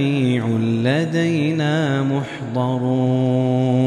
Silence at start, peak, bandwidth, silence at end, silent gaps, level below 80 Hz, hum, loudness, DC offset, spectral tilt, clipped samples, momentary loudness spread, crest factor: 0 s; -4 dBFS; 10 kHz; 0 s; none; -62 dBFS; none; -19 LUFS; under 0.1%; -7.5 dB/octave; under 0.1%; 4 LU; 14 dB